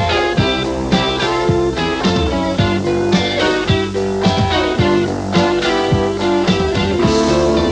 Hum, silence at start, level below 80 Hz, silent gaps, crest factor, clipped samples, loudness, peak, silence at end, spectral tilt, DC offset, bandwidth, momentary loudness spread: none; 0 s; -30 dBFS; none; 14 dB; under 0.1%; -15 LUFS; 0 dBFS; 0 s; -5.5 dB/octave; under 0.1%; 9.8 kHz; 3 LU